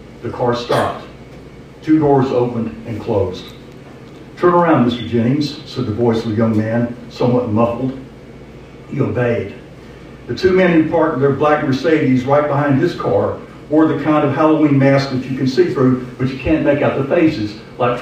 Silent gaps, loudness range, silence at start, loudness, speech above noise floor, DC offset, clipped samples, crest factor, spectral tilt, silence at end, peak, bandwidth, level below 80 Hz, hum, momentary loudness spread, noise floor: none; 4 LU; 0 s; -16 LUFS; 21 dB; under 0.1%; under 0.1%; 14 dB; -8 dB/octave; 0 s; -2 dBFS; 10.5 kHz; -44 dBFS; none; 15 LU; -36 dBFS